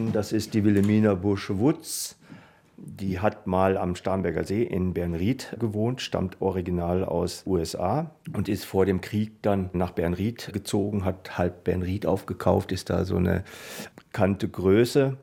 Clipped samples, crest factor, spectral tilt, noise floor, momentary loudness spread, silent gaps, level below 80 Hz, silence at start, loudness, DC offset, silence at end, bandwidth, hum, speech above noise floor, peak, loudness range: under 0.1%; 20 dB; -6.5 dB/octave; -50 dBFS; 8 LU; none; -56 dBFS; 0 s; -26 LUFS; under 0.1%; 0 s; 17 kHz; none; 24 dB; -6 dBFS; 2 LU